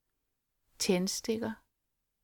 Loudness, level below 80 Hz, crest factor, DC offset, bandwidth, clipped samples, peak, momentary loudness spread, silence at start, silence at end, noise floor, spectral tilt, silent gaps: -33 LUFS; -68 dBFS; 20 dB; under 0.1%; 19 kHz; under 0.1%; -16 dBFS; 10 LU; 0.8 s; 0.7 s; -83 dBFS; -4 dB/octave; none